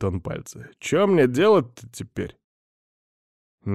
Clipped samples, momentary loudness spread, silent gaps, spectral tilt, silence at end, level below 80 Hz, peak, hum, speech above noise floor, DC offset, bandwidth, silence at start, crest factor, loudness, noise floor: under 0.1%; 19 LU; 2.44-3.58 s; -6 dB/octave; 0 s; -54 dBFS; -8 dBFS; none; over 68 dB; under 0.1%; 13.5 kHz; 0 s; 16 dB; -21 LUFS; under -90 dBFS